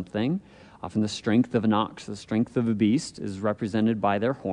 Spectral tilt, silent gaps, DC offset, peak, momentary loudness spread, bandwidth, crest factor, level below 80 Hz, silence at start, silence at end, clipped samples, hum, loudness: -6.5 dB/octave; none; under 0.1%; -10 dBFS; 9 LU; 10.5 kHz; 16 dB; -62 dBFS; 0 s; 0 s; under 0.1%; none; -26 LUFS